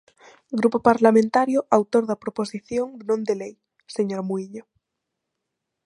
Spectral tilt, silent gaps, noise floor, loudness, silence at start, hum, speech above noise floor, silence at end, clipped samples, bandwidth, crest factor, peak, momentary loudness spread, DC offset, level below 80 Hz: -6.5 dB/octave; none; -82 dBFS; -22 LUFS; 0.5 s; none; 60 dB; 1.25 s; under 0.1%; 11.5 kHz; 22 dB; -2 dBFS; 14 LU; under 0.1%; -66 dBFS